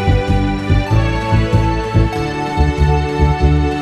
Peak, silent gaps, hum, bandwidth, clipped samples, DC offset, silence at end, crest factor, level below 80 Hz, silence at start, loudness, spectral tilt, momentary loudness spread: 0 dBFS; none; none; 10 kHz; under 0.1%; under 0.1%; 0 s; 14 dB; -18 dBFS; 0 s; -15 LUFS; -7.5 dB/octave; 3 LU